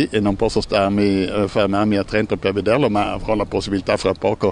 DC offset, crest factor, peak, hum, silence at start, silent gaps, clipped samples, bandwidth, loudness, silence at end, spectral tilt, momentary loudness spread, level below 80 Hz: under 0.1%; 16 dB; -2 dBFS; none; 0 s; none; under 0.1%; 10.5 kHz; -19 LUFS; 0 s; -6 dB/octave; 4 LU; -38 dBFS